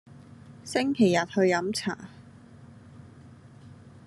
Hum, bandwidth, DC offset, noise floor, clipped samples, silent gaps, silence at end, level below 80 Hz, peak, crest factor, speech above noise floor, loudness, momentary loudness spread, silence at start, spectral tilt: none; 12.5 kHz; under 0.1%; -50 dBFS; under 0.1%; none; 0.15 s; -70 dBFS; -10 dBFS; 20 dB; 25 dB; -26 LUFS; 19 LU; 0.15 s; -5 dB/octave